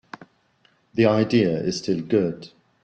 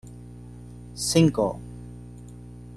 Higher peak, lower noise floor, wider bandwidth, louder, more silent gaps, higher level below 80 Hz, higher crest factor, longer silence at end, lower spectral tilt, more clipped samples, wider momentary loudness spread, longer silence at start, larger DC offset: about the same, -6 dBFS vs -6 dBFS; first, -63 dBFS vs -42 dBFS; second, 8.8 kHz vs 13 kHz; about the same, -22 LUFS vs -23 LUFS; neither; second, -60 dBFS vs -48 dBFS; about the same, 18 dB vs 22 dB; first, 0.35 s vs 0 s; about the same, -6.5 dB/octave vs -5.5 dB/octave; neither; second, 20 LU vs 23 LU; first, 0.95 s vs 0.05 s; neither